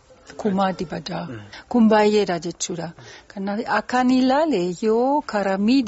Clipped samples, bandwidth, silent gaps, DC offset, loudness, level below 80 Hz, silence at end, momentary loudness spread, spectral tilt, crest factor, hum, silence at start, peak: under 0.1%; 8 kHz; none; under 0.1%; -21 LUFS; -56 dBFS; 0 s; 14 LU; -4.5 dB/octave; 16 dB; none; 0.3 s; -6 dBFS